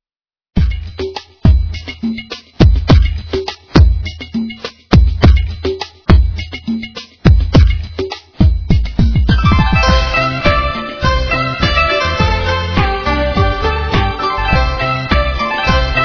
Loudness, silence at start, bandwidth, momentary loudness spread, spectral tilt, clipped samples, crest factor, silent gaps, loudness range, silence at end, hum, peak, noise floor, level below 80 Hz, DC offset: -14 LUFS; 0.55 s; 5.4 kHz; 11 LU; -6.5 dB/octave; 0.7%; 12 dB; none; 2 LU; 0 s; none; 0 dBFS; under -90 dBFS; -16 dBFS; under 0.1%